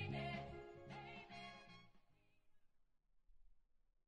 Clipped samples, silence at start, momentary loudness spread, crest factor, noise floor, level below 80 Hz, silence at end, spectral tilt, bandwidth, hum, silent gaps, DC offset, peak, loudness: under 0.1%; 0 s; 15 LU; 20 dB; -76 dBFS; -72 dBFS; 0.3 s; -6.5 dB/octave; 10 kHz; none; none; under 0.1%; -36 dBFS; -52 LUFS